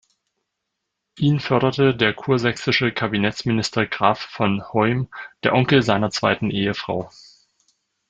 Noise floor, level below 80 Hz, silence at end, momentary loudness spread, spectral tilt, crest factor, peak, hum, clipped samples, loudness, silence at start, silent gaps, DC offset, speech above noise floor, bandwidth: -79 dBFS; -54 dBFS; 1 s; 7 LU; -6 dB/octave; 20 dB; -2 dBFS; none; under 0.1%; -20 LUFS; 1.15 s; none; under 0.1%; 59 dB; 9 kHz